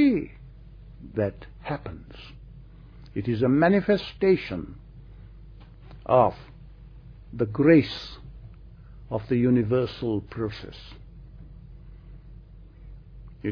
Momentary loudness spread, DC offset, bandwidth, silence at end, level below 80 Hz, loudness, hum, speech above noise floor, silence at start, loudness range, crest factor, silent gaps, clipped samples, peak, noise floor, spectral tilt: 27 LU; under 0.1%; 5.4 kHz; 0 s; -46 dBFS; -25 LUFS; none; 22 dB; 0 s; 9 LU; 22 dB; none; under 0.1%; -6 dBFS; -46 dBFS; -9 dB/octave